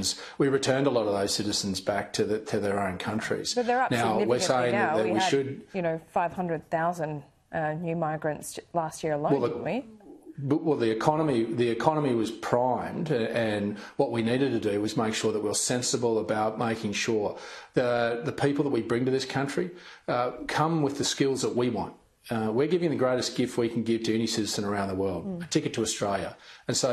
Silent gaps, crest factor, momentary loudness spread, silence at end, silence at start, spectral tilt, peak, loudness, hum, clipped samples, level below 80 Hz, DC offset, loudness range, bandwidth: none; 22 dB; 7 LU; 0 s; 0 s; -4.5 dB/octave; -6 dBFS; -28 LUFS; none; under 0.1%; -64 dBFS; under 0.1%; 4 LU; 13 kHz